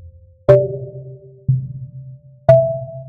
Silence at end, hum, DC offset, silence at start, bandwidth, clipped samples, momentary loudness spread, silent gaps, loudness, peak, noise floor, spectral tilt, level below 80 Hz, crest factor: 0 s; none; under 0.1%; 0.05 s; 4.7 kHz; under 0.1%; 22 LU; none; -16 LUFS; 0 dBFS; -38 dBFS; -10 dB/octave; -46 dBFS; 18 dB